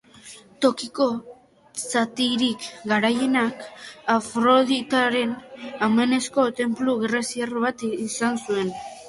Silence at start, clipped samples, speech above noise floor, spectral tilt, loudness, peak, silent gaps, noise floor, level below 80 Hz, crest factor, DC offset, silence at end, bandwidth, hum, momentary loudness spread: 0.25 s; under 0.1%; 23 dB; -3.5 dB/octave; -23 LUFS; -4 dBFS; none; -46 dBFS; -66 dBFS; 20 dB; under 0.1%; 0 s; 11.5 kHz; none; 13 LU